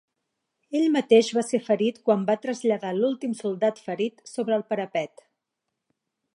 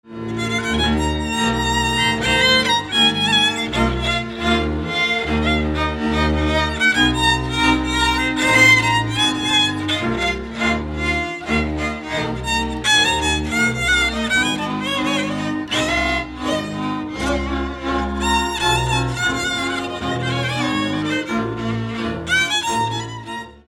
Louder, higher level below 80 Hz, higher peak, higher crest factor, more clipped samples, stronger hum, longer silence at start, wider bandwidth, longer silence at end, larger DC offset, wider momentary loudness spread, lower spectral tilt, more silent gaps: second, -25 LUFS vs -18 LUFS; second, -82 dBFS vs -32 dBFS; second, -6 dBFS vs -2 dBFS; about the same, 20 dB vs 18 dB; neither; neither; first, 0.7 s vs 0.05 s; second, 11.5 kHz vs 18 kHz; first, 1.3 s vs 0.1 s; neither; about the same, 11 LU vs 9 LU; first, -5 dB/octave vs -3.5 dB/octave; neither